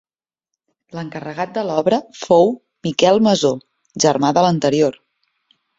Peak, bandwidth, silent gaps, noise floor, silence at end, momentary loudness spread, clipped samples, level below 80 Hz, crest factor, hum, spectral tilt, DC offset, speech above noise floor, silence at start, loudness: -2 dBFS; 7.8 kHz; none; -82 dBFS; 0.85 s; 15 LU; under 0.1%; -58 dBFS; 16 dB; none; -5 dB/octave; under 0.1%; 66 dB; 0.95 s; -17 LUFS